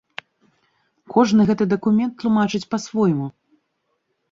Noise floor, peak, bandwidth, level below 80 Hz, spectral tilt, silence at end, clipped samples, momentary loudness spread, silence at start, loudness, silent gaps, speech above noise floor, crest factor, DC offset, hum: -72 dBFS; -4 dBFS; 7.6 kHz; -60 dBFS; -6.5 dB/octave; 1 s; under 0.1%; 13 LU; 1.1 s; -19 LUFS; none; 54 dB; 18 dB; under 0.1%; none